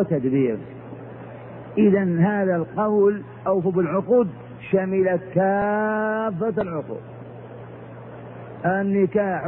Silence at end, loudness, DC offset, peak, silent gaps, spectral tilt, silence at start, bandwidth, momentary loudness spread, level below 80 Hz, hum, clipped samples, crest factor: 0 s; -22 LUFS; under 0.1%; -8 dBFS; none; -12.5 dB/octave; 0 s; 3.7 kHz; 20 LU; -58 dBFS; none; under 0.1%; 16 dB